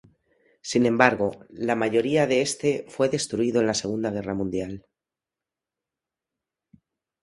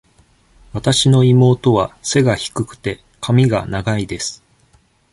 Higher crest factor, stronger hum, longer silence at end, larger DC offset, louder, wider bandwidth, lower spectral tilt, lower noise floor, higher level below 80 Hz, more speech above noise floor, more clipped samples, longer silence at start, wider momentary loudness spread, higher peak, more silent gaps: first, 26 dB vs 16 dB; neither; first, 2.45 s vs 0.75 s; neither; second, -24 LUFS vs -16 LUFS; about the same, 11.5 kHz vs 11.5 kHz; about the same, -4.5 dB/octave vs -5.5 dB/octave; first, -89 dBFS vs -55 dBFS; second, -58 dBFS vs -42 dBFS; first, 65 dB vs 40 dB; neither; about the same, 0.65 s vs 0.75 s; second, 11 LU vs 14 LU; about the same, 0 dBFS vs -2 dBFS; neither